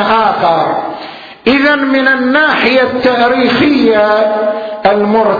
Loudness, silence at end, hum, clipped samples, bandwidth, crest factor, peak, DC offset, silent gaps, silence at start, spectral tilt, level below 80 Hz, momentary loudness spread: -10 LUFS; 0 s; none; under 0.1%; 5.4 kHz; 10 dB; 0 dBFS; under 0.1%; none; 0 s; -6.5 dB/octave; -46 dBFS; 7 LU